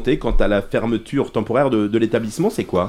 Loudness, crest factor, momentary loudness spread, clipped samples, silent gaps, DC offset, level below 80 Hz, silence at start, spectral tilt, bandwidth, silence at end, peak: -20 LUFS; 16 dB; 4 LU; under 0.1%; none; under 0.1%; -28 dBFS; 0 s; -6.5 dB/octave; 14.5 kHz; 0 s; -2 dBFS